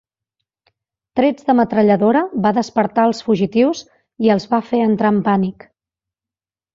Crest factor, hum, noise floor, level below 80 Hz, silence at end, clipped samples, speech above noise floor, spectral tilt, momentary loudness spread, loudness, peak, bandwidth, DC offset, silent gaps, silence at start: 16 dB; none; under -90 dBFS; -58 dBFS; 1.25 s; under 0.1%; over 75 dB; -7 dB/octave; 5 LU; -16 LUFS; -2 dBFS; 7.6 kHz; under 0.1%; none; 1.15 s